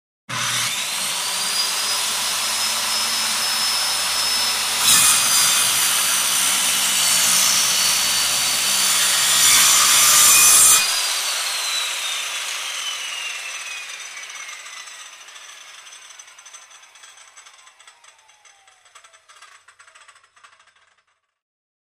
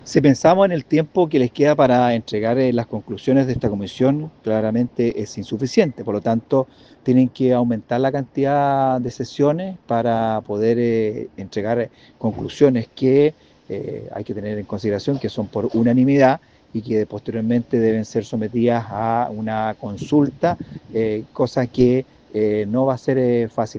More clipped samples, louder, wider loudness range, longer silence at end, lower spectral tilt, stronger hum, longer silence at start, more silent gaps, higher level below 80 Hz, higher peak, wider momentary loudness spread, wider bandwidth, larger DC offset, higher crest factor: neither; first, -15 LUFS vs -19 LUFS; first, 18 LU vs 3 LU; first, 2.35 s vs 0 s; second, 2 dB/octave vs -7.5 dB/octave; neither; first, 0.3 s vs 0.05 s; neither; second, -58 dBFS vs -52 dBFS; about the same, -2 dBFS vs 0 dBFS; first, 18 LU vs 11 LU; first, 15.5 kHz vs 7.6 kHz; neither; about the same, 18 dB vs 18 dB